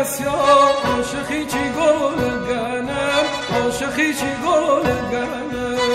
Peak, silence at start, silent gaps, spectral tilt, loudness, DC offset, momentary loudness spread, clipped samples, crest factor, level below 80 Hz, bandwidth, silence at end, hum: -4 dBFS; 0 s; none; -4 dB/octave; -19 LUFS; under 0.1%; 9 LU; under 0.1%; 16 dB; -44 dBFS; 16 kHz; 0 s; none